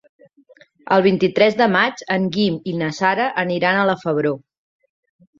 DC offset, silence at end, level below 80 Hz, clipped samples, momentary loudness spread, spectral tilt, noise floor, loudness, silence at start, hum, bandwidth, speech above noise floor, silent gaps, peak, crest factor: under 0.1%; 1 s; -62 dBFS; under 0.1%; 7 LU; -6 dB/octave; -52 dBFS; -18 LUFS; 0.85 s; none; 7.6 kHz; 34 dB; none; -2 dBFS; 18 dB